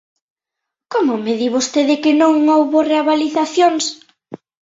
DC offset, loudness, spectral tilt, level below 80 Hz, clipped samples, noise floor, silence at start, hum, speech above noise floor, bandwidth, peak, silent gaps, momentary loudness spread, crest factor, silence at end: under 0.1%; -15 LUFS; -3 dB/octave; -64 dBFS; under 0.1%; -82 dBFS; 0.9 s; none; 67 dB; 8 kHz; -2 dBFS; none; 6 LU; 14 dB; 0.3 s